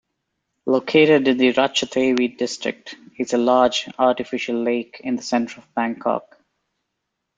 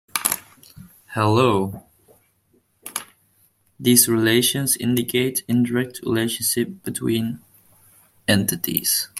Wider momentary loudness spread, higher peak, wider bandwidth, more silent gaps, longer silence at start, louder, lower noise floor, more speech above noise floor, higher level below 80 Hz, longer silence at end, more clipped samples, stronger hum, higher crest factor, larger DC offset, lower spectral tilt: second, 12 LU vs 15 LU; about the same, -2 dBFS vs 0 dBFS; second, 9.2 kHz vs 16.5 kHz; neither; first, 0.65 s vs 0.15 s; about the same, -20 LUFS vs -20 LUFS; first, -78 dBFS vs -63 dBFS; first, 58 dB vs 43 dB; about the same, -62 dBFS vs -58 dBFS; first, 1.15 s vs 0 s; neither; neither; about the same, 20 dB vs 22 dB; neither; about the same, -4 dB/octave vs -3.5 dB/octave